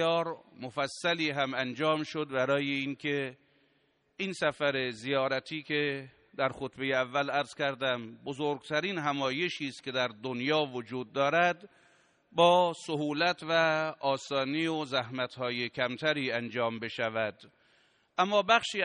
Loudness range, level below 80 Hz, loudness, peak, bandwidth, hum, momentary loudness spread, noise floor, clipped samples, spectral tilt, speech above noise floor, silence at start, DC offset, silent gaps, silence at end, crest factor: 4 LU; -74 dBFS; -31 LUFS; -10 dBFS; 10 kHz; none; 9 LU; -72 dBFS; under 0.1%; -4.5 dB/octave; 41 dB; 0 s; under 0.1%; none; 0 s; 22 dB